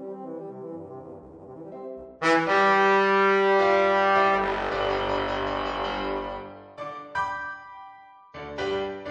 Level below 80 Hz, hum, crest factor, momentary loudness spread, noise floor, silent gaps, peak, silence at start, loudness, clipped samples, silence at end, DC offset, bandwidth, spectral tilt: -50 dBFS; none; 18 dB; 22 LU; -49 dBFS; none; -8 dBFS; 0 s; -23 LUFS; under 0.1%; 0 s; under 0.1%; 9.6 kHz; -5 dB/octave